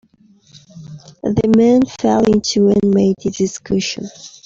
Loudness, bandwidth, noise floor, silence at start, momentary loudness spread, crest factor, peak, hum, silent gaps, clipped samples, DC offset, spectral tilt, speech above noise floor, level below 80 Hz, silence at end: -15 LUFS; 7.8 kHz; -51 dBFS; 0.75 s; 13 LU; 14 dB; -2 dBFS; none; none; under 0.1%; under 0.1%; -6 dB/octave; 36 dB; -46 dBFS; 0.15 s